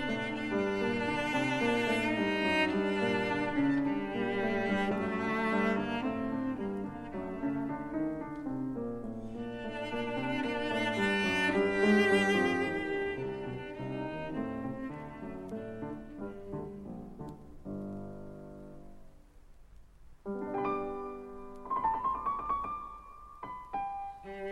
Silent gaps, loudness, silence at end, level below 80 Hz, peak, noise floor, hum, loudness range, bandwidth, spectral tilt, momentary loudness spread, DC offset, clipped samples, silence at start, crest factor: none; -33 LUFS; 0 s; -56 dBFS; -16 dBFS; -55 dBFS; none; 14 LU; 13 kHz; -6 dB/octave; 16 LU; under 0.1%; under 0.1%; 0 s; 18 dB